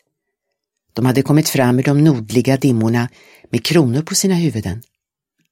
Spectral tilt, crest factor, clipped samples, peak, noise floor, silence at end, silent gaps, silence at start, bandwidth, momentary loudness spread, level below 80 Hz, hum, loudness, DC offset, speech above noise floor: -5.5 dB/octave; 16 dB; under 0.1%; 0 dBFS; -77 dBFS; 0.7 s; none; 0.95 s; 16.5 kHz; 11 LU; -52 dBFS; none; -16 LUFS; under 0.1%; 62 dB